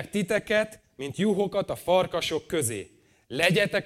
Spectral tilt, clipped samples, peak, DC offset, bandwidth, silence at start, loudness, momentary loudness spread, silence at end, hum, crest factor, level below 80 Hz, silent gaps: -4 dB/octave; under 0.1%; -8 dBFS; under 0.1%; 16.5 kHz; 0 s; -26 LUFS; 14 LU; 0 s; none; 20 dB; -58 dBFS; none